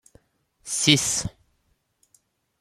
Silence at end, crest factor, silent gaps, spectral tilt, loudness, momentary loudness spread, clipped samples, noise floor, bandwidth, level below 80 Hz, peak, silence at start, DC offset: 1.3 s; 28 dB; none; -2.5 dB/octave; -21 LUFS; 19 LU; under 0.1%; -70 dBFS; 15 kHz; -54 dBFS; 0 dBFS; 0.65 s; under 0.1%